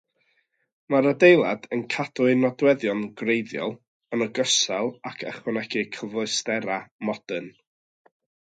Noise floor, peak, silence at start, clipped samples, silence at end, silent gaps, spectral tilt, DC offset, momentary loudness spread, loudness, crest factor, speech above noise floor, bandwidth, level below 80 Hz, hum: -70 dBFS; -2 dBFS; 0.9 s; under 0.1%; 1.05 s; 3.88-4.00 s, 6.91-6.99 s; -3.5 dB/octave; under 0.1%; 14 LU; -24 LUFS; 22 dB; 47 dB; 9.4 kHz; -74 dBFS; none